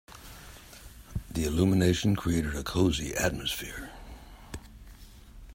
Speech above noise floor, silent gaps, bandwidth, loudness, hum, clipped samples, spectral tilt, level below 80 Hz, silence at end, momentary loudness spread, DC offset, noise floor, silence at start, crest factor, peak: 22 dB; none; 16 kHz; -29 LUFS; none; under 0.1%; -5 dB/octave; -44 dBFS; 0 s; 23 LU; under 0.1%; -49 dBFS; 0.1 s; 20 dB; -12 dBFS